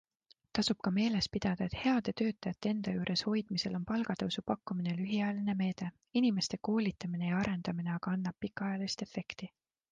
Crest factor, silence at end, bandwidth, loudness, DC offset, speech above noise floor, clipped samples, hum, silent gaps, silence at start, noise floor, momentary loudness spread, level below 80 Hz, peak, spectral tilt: 18 dB; 0.45 s; 9.4 kHz; -35 LUFS; under 0.1%; 35 dB; under 0.1%; none; none; 0.55 s; -69 dBFS; 7 LU; -62 dBFS; -16 dBFS; -5.5 dB/octave